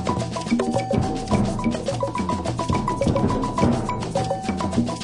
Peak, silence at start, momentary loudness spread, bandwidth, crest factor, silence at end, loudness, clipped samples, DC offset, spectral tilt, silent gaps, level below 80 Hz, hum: -6 dBFS; 0 s; 4 LU; 11 kHz; 18 dB; 0 s; -23 LUFS; under 0.1%; under 0.1%; -6.5 dB/octave; none; -38 dBFS; none